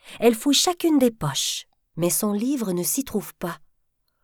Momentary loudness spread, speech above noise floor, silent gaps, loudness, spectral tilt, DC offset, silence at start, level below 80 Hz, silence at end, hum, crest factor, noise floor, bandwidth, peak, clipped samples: 14 LU; 48 dB; none; -22 LUFS; -3.5 dB/octave; under 0.1%; 0.05 s; -56 dBFS; 0.7 s; none; 18 dB; -70 dBFS; over 20 kHz; -6 dBFS; under 0.1%